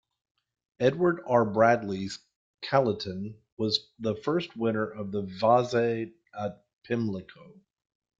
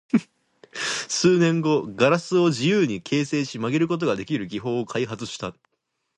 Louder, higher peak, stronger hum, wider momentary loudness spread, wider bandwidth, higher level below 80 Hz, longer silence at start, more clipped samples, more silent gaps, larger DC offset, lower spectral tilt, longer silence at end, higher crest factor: second, -28 LUFS vs -23 LUFS; about the same, -8 dBFS vs -6 dBFS; neither; first, 14 LU vs 10 LU; second, 7.8 kHz vs 11.5 kHz; about the same, -66 dBFS vs -62 dBFS; first, 0.8 s vs 0.15 s; neither; first, 2.36-2.58 s, 3.52-3.57 s, 6.73-6.82 s vs none; neither; about the same, -6 dB/octave vs -5 dB/octave; about the same, 0.7 s vs 0.65 s; about the same, 22 dB vs 18 dB